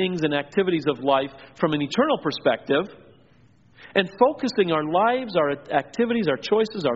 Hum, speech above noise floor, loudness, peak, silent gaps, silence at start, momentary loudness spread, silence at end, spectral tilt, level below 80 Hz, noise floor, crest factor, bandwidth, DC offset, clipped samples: none; 34 dB; -23 LUFS; -2 dBFS; none; 0 s; 4 LU; 0 s; -3.5 dB/octave; -62 dBFS; -56 dBFS; 20 dB; 7.6 kHz; under 0.1%; under 0.1%